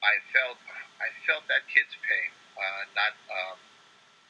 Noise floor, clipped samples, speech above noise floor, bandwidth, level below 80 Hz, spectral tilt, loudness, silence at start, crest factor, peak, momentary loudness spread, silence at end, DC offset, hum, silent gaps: -58 dBFS; under 0.1%; 30 dB; 10 kHz; under -90 dBFS; 0 dB/octave; -28 LUFS; 0 s; 24 dB; -6 dBFS; 12 LU; 0.75 s; under 0.1%; none; none